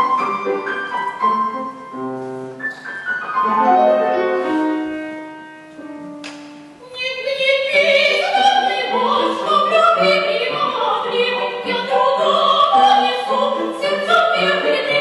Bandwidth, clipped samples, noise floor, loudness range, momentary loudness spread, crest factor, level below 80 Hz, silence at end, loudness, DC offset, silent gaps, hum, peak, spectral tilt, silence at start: 12 kHz; under 0.1%; -38 dBFS; 7 LU; 17 LU; 14 dB; -66 dBFS; 0 s; -16 LUFS; under 0.1%; none; none; -4 dBFS; -3.5 dB/octave; 0 s